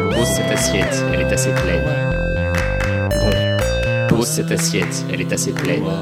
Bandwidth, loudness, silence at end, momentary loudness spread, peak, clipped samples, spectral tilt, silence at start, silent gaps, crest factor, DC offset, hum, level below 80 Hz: 16.5 kHz; -18 LUFS; 0 s; 3 LU; -2 dBFS; under 0.1%; -4.5 dB/octave; 0 s; none; 14 dB; under 0.1%; none; -28 dBFS